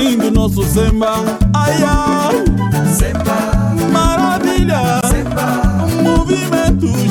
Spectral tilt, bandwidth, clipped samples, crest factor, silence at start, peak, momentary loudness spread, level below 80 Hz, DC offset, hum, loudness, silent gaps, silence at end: -5.5 dB/octave; 19 kHz; under 0.1%; 10 dB; 0 s; -2 dBFS; 2 LU; -20 dBFS; under 0.1%; none; -14 LUFS; none; 0 s